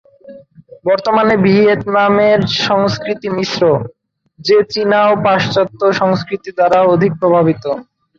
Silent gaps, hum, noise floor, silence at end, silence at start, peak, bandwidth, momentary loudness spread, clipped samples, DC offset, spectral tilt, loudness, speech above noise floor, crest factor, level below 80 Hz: none; none; -39 dBFS; 0.35 s; 0.25 s; -2 dBFS; 7.4 kHz; 9 LU; under 0.1%; under 0.1%; -6 dB/octave; -13 LUFS; 27 dB; 12 dB; -50 dBFS